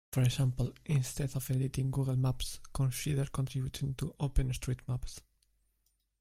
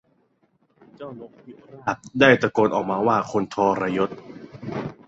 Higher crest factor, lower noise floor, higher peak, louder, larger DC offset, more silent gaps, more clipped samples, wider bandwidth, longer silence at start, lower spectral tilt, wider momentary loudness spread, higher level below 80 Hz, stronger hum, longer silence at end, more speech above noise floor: about the same, 18 dB vs 22 dB; first, -78 dBFS vs -65 dBFS; second, -16 dBFS vs 0 dBFS; second, -34 LUFS vs -22 LUFS; neither; neither; neither; first, 16 kHz vs 8 kHz; second, 0.1 s vs 1 s; about the same, -6 dB/octave vs -6 dB/octave; second, 8 LU vs 23 LU; first, -44 dBFS vs -60 dBFS; neither; first, 1 s vs 0.15 s; about the same, 45 dB vs 43 dB